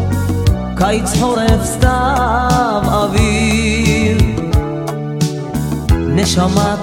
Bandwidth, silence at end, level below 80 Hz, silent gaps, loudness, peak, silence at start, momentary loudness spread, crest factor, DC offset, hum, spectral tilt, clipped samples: 17.5 kHz; 0 s; -22 dBFS; none; -14 LUFS; 0 dBFS; 0 s; 5 LU; 14 dB; 0.2%; none; -5.5 dB/octave; under 0.1%